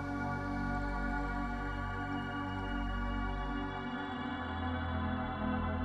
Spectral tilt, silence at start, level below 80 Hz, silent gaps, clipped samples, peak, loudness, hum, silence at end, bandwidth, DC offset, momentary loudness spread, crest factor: -7.5 dB/octave; 0 s; -42 dBFS; none; under 0.1%; -24 dBFS; -38 LUFS; none; 0 s; 9.2 kHz; under 0.1%; 3 LU; 12 dB